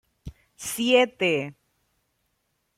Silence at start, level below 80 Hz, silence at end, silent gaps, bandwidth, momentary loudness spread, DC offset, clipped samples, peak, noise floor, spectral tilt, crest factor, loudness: 0.25 s; -56 dBFS; 1.25 s; none; 15.5 kHz; 16 LU; under 0.1%; under 0.1%; -6 dBFS; -74 dBFS; -3.5 dB/octave; 20 dB; -23 LUFS